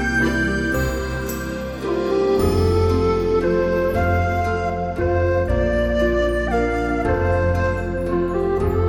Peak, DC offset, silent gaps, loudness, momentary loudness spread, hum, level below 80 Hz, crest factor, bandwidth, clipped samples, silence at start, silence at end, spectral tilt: -6 dBFS; under 0.1%; none; -20 LUFS; 6 LU; none; -28 dBFS; 14 dB; 18.5 kHz; under 0.1%; 0 s; 0 s; -7 dB/octave